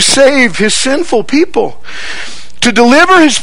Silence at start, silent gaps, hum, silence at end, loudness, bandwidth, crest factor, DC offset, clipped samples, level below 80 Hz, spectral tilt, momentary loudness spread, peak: 0 s; none; none; 0 s; -8 LUFS; over 20 kHz; 10 dB; 10%; 2%; -40 dBFS; -2.5 dB/octave; 17 LU; 0 dBFS